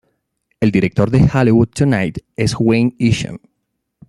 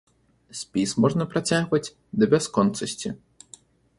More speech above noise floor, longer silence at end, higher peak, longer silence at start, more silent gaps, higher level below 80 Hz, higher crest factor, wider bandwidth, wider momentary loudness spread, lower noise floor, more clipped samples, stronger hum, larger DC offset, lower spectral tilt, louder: first, 58 dB vs 29 dB; second, 0.7 s vs 0.85 s; about the same, -2 dBFS vs -4 dBFS; about the same, 0.6 s vs 0.55 s; neither; first, -40 dBFS vs -58 dBFS; second, 14 dB vs 20 dB; about the same, 12 kHz vs 11.5 kHz; second, 8 LU vs 14 LU; first, -72 dBFS vs -52 dBFS; neither; neither; neither; first, -7 dB/octave vs -5 dB/octave; first, -15 LUFS vs -24 LUFS